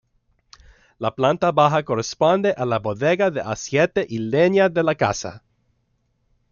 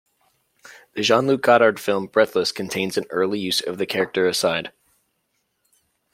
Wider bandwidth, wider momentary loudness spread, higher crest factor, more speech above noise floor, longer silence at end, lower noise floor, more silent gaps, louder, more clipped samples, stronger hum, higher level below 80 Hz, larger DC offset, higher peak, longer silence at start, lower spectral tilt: second, 7.4 kHz vs 16.5 kHz; about the same, 9 LU vs 9 LU; about the same, 18 dB vs 20 dB; second, 48 dB vs 52 dB; second, 1.15 s vs 1.45 s; second, -68 dBFS vs -72 dBFS; neither; about the same, -20 LUFS vs -20 LUFS; neither; neither; first, -56 dBFS vs -66 dBFS; neither; about the same, -2 dBFS vs -2 dBFS; first, 1 s vs 0.7 s; first, -5.5 dB/octave vs -3.5 dB/octave